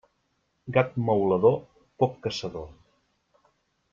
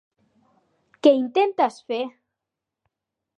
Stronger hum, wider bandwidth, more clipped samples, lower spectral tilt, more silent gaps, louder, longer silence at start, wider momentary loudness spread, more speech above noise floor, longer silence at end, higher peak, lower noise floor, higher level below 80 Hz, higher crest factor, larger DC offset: neither; second, 7.4 kHz vs 10 kHz; neither; first, -7 dB/octave vs -4.5 dB/octave; neither; second, -26 LUFS vs -21 LUFS; second, 0.65 s vs 1.05 s; first, 18 LU vs 11 LU; second, 49 dB vs 65 dB; about the same, 1.2 s vs 1.3 s; about the same, -6 dBFS vs -4 dBFS; second, -73 dBFS vs -85 dBFS; first, -60 dBFS vs -84 dBFS; about the same, 22 dB vs 22 dB; neither